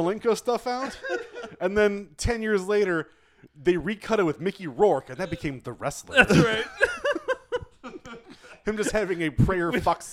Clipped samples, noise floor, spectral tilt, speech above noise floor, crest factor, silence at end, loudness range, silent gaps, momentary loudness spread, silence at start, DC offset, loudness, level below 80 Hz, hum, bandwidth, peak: under 0.1%; -48 dBFS; -5.5 dB/octave; 24 dB; 22 dB; 0 s; 4 LU; none; 12 LU; 0 s; under 0.1%; -25 LUFS; -44 dBFS; none; 15 kHz; -4 dBFS